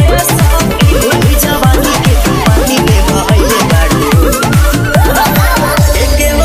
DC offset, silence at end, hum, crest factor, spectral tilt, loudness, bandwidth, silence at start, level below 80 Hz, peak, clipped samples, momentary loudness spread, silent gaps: under 0.1%; 0 s; none; 8 dB; -5 dB/octave; -9 LUFS; 16 kHz; 0 s; -12 dBFS; 0 dBFS; 1%; 1 LU; none